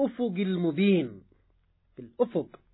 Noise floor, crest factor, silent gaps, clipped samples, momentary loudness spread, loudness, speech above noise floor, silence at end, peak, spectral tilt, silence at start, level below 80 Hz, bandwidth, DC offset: -67 dBFS; 16 dB; none; under 0.1%; 16 LU; -28 LUFS; 40 dB; 0.25 s; -14 dBFS; -11 dB/octave; 0 s; -68 dBFS; 4.1 kHz; under 0.1%